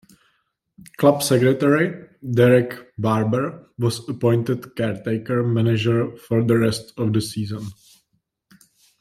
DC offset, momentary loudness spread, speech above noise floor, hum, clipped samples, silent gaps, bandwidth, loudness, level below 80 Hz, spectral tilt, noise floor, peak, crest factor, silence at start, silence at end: under 0.1%; 11 LU; 51 dB; none; under 0.1%; none; 14.5 kHz; -20 LUFS; -58 dBFS; -6.5 dB/octave; -71 dBFS; -2 dBFS; 18 dB; 1 s; 1.25 s